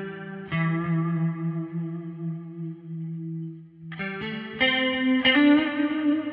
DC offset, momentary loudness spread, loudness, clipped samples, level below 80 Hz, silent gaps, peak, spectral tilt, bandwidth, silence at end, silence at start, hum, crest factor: under 0.1%; 17 LU; -25 LUFS; under 0.1%; -64 dBFS; none; -8 dBFS; -9 dB/octave; 5 kHz; 0 s; 0 s; none; 18 dB